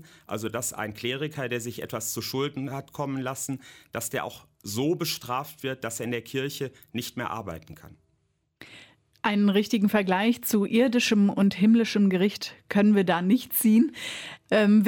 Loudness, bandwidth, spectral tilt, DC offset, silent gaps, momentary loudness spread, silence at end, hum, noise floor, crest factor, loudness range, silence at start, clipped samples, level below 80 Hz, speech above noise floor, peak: -26 LUFS; 17.5 kHz; -5 dB/octave; under 0.1%; none; 13 LU; 0 s; none; -72 dBFS; 16 dB; 11 LU; 0.3 s; under 0.1%; -66 dBFS; 47 dB; -10 dBFS